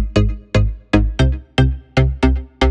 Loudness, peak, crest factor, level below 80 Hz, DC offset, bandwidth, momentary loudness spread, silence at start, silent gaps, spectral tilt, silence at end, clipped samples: -18 LUFS; 0 dBFS; 16 dB; -20 dBFS; under 0.1%; 9 kHz; 3 LU; 0 s; none; -7 dB/octave; 0 s; under 0.1%